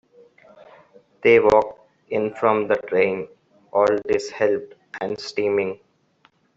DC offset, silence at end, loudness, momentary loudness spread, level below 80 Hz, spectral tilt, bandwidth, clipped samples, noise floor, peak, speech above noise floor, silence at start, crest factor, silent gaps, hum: under 0.1%; 0.8 s; -21 LUFS; 15 LU; -58 dBFS; -5.5 dB/octave; 8 kHz; under 0.1%; -61 dBFS; -2 dBFS; 41 dB; 1.25 s; 20 dB; none; none